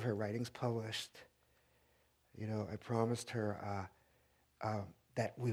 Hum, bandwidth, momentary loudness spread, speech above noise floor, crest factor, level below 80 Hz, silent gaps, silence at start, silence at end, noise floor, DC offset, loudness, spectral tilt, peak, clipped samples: none; 15.5 kHz; 9 LU; 34 dB; 22 dB; -74 dBFS; none; 0 s; 0 s; -74 dBFS; under 0.1%; -42 LUFS; -6 dB/octave; -20 dBFS; under 0.1%